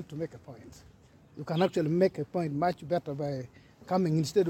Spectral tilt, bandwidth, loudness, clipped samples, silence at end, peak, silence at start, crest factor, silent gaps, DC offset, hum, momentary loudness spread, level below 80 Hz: -7 dB/octave; 16.5 kHz; -30 LUFS; under 0.1%; 0 s; -12 dBFS; 0 s; 18 dB; none; under 0.1%; none; 21 LU; -64 dBFS